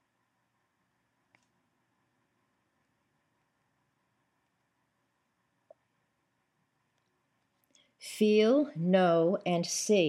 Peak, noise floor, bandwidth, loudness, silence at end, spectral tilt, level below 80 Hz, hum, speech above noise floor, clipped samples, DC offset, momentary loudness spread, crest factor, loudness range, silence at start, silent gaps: -12 dBFS; -78 dBFS; 13 kHz; -27 LUFS; 0 s; -5 dB/octave; -90 dBFS; none; 52 dB; under 0.1%; under 0.1%; 7 LU; 20 dB; 5 LU; 8.05 s; none